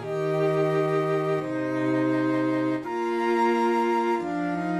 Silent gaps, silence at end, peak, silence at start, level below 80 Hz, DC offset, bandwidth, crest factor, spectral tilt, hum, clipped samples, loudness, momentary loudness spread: none; 0 s; -12 dBFS; 0 s; -68 dBFS; under 0.1%; 12.5 kHz; 12 dB; -7.5 dB/octave; none; under 0.1%; -25 LUFS; 5 LU